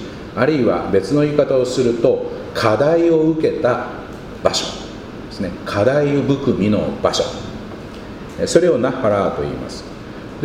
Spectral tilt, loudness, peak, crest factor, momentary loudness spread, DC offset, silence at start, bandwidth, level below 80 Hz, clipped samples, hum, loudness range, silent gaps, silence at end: -5.5 dB/octave; -17 LUFS; 0 dBFS; 18 dB; 17 LU; under 0.1%; 0 s; 15 kHz; -42 dBFS; under 0.1%; none; 3 LU; none; 0 s